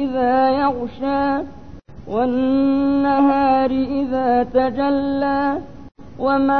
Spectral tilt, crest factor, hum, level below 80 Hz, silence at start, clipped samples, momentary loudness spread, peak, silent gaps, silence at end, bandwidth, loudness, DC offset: -8.5 dB/octave; 14 dB; none; -46 dBFS; 0 s; under 0.1%; 8 LU; -4 dBFS; none; 0 s; 4.7 kHz; -18 LUFS; 0.9%